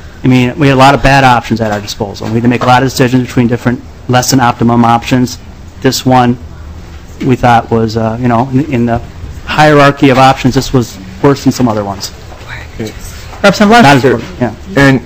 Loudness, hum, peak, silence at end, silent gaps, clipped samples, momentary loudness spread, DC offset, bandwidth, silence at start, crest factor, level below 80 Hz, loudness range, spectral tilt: -9 LUFS; none; 0 dBFS; 0 s; none; 5%; 17 LU; 0.9%; 16 kHz; 0 s; 8 dB; -28 dBFS; 3 LU; -5.5 dB/octave